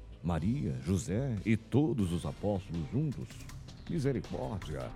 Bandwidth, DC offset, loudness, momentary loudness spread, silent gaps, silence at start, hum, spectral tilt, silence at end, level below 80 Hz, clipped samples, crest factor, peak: 14.5 kHz; under 0.1%; -34 LUFS; 11 LU; none; 0 s; none; -7.5 dB/octave; 0 s; -50 dBFS; under 0.1%; 18 dB; -16 dBFS